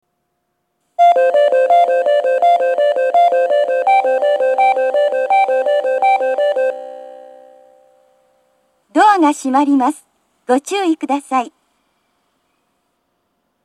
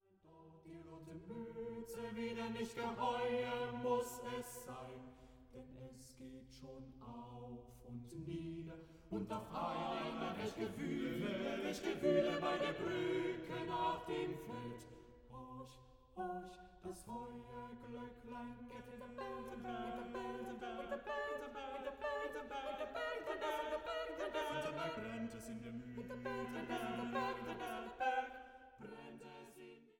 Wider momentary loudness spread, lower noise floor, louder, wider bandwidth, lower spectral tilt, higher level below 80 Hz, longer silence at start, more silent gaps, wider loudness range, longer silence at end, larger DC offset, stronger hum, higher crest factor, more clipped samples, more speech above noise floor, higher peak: second, 8 LU vs 17 LU; first, -70 dBFS vs -65 dBFS; first, -14 LUFS vs -44 LUFS; second, 12.5 kHz vs 17 kHz; second, -2.5 dB/octave vs -5.5 dB/octave; second, -78 dBFS vs -68 dBFS; first, 1 s vs 0.25 s; neither; second, 7 LU vs 12 LU; first, 2.15 s vs 0.1 s; neither; neither; second, 16 dB vs 22 dB; neither; first, 54 dB vs 21 dB; first, 0 dBFS vs -22 dBFS